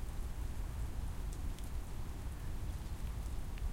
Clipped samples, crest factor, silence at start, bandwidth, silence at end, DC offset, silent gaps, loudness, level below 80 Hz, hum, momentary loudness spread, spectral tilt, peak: under 0.1%; 12 dB; 0 s; 16.5 kHz; 0 s; under 0.1%; none; -45 LUFS; -42 dBFS; none; 2 LU; -5.5 dB/octave; -28 dBFS